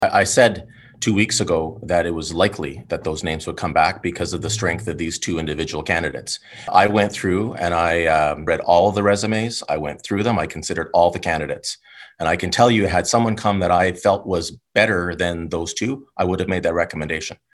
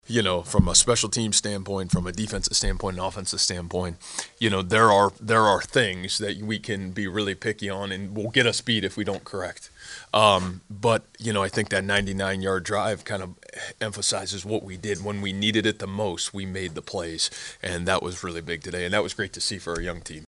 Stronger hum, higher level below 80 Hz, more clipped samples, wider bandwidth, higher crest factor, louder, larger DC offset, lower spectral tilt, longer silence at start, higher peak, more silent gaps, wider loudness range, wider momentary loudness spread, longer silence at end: neither; about the same, -44 dBFS vs -42 dBFS; neither; about the same, 12.5 kHz vs 11.5 kHz; about the same, 20 dB vs 24 dB; first, -20 LUFS vs -25 LUFS; neither; about the same, -4.5 dB/octave vs -3.5 dB/octave; about the same, 0 s vs 0.1 s; about the same, 0 dBFS vs -2 dBFS; neither; about the same, 4 LU vs 5 LU; about the same, 10 LU vs 12 LU; first, 0.25 s vs 0 s